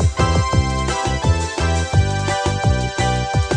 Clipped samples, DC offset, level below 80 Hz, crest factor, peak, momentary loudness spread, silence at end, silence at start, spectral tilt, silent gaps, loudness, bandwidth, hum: under 0.1%; under 0.1%; -26 dBFS; 14 dB; -4 dBFS; 3 LU; 0 s; 0 s; -5 dB/octave; none; -19 LUFS; 10.5 kHz; none